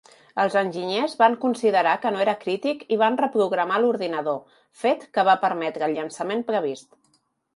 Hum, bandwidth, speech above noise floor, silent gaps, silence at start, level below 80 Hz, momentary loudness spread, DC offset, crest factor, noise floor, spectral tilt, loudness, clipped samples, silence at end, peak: none; 11.5 kHz; 44 dB; none; 0.35 s; -76 dBFS; 8 LU; under 0.1%; 18 dB; -67 dBFS; -5 dB/octave; -23 LUFS; under 0.1%; 0.75 s; -6 dBFS